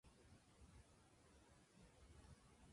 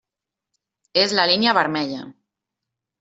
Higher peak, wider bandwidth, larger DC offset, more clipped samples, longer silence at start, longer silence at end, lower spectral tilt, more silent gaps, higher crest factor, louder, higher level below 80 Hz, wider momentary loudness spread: second, -54 dBFS vs -2 dBFS; first, 11.5 kHz vs 8 kHz; neither; neither; second, 0.05 s vs 0.95 s; second, 0 s vs 0.9 s; about the same, -4.5 dB/octave vs -3.5 dB/octave; neither; second, 16 dB vs 22 dB; second, -68 LUFS vs -19 LUFS; second, -74 dBFS vs -68 dBFS; second, 2 LU vs 11 LU